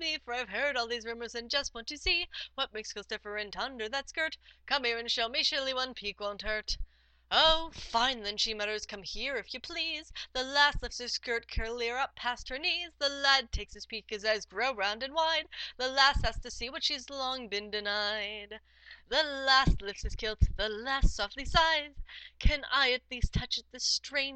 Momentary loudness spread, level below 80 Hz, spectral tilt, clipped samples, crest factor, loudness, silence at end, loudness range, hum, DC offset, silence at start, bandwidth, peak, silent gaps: 13 LU; -40 dBFS; -2.5 dB/octave; under 0.1%; 24 dB; -31 LUFS; 0 s; 4 LU; none; under 0.1%; 0 s; 8.8 kHz; -10 dBFS; none